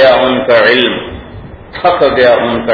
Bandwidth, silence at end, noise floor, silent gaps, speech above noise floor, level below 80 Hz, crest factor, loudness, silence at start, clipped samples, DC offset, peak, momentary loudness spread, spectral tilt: 5.4 kHz; 0 s; -29 dBFS; none; 20 dB; -36 dBFS; 10 dB; -9 LUFS; 0 s; 0.5%; under 0.1%; 0 dBFS; 20 LU; -6.5 dB/octave